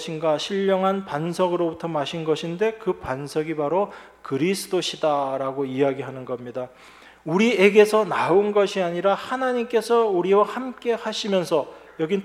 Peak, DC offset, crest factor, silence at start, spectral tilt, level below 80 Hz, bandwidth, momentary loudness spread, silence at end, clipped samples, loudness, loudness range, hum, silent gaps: -2 dBFS; under 0.1%; 20 dB; 0 s; -5 dB/octave; -62 dBFS; 14.5 kHz; 12 LU; 0 s; under 0.1%; -22 LUFS; 6 LU; none; none